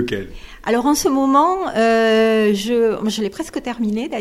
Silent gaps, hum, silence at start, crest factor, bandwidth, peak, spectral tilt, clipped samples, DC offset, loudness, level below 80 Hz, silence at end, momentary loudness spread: none; none; 0 s; 14 dB; 15.5 kHz; -2 dBFS; -4.5 dB/octave; under 0.1%; under 0.1%; -17 LUFS; -44 dBFS; 0 s; 11 LU